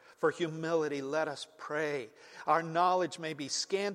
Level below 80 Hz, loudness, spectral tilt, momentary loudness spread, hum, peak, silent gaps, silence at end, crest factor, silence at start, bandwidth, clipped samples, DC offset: -84 dBFS; -33 LUFS; -4 dB/octave; 11 LU; none; -14 dBFS; none; 0 s; 18 dB; 0.2 s; 14 kHz; under 0.1%; under 0.1%